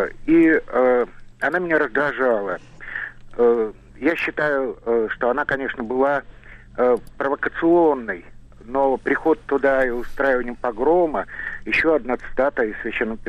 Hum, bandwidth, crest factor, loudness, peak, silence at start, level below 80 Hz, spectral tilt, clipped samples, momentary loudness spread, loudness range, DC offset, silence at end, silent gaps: none; 8.4 kHz; 14 dB; -21 LUFS; -8 dBFS; 0 s; -42 dBFS; -7 dB/octave; under 0.1%; 11 LU; 2 LU; under 0.1%; 0 s; none